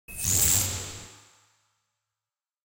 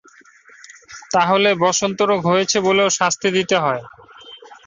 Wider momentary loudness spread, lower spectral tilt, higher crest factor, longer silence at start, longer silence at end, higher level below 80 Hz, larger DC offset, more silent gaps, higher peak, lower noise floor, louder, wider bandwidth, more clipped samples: first, 19 LU vs 7 LU; second, -1.5 dB/octave vs -3 dB/octave; first, 22 dB vs 16 dB; second, 0.1 s vs 0.9 s; first, 1.5 s vs 0.1 s; first, -48 dBFS vs -60 dBFS; neither; neither; second, -10 dBFS vs -2 dBFS; first, under -90 dBFS vs -48 dBFS; second, -23 LUFS vs -17 LUFS; first, 17 kHz vs 7.8 kHz; neither